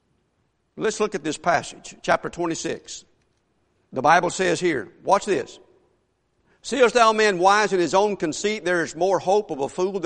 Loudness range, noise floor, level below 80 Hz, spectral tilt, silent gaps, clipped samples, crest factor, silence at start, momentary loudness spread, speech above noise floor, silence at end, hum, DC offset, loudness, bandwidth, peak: 7 LU; -69 dBFS; -58 dBFS; -3.5 dB/octave; none; under 0.1%; 20 dB; 0.75 s; 13 LU; 48 dB; 0 s; none; under 0.1%; -21 LUFS; 10.5 kHz; -2 dBFS